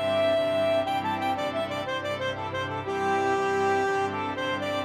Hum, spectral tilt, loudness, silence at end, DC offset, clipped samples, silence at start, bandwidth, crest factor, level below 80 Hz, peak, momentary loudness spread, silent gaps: none; -5 dB/octave; -27 LUFS; 0 s; under 0.1%; under 0.1%; 0 s; 15 kHz; 12 dB; -62 dBFS; -14 dBFS; 6 LU; none